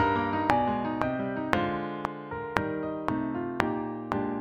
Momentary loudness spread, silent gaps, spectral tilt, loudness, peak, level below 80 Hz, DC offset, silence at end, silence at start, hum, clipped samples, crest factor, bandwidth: 8 LU; none; -7 dB/octave; -30 LUFS; -2 dBFS; -52 dBFS; under 0.1%; 0 s; 0 s; none; under 0.1%; 28 dB; 15 kHz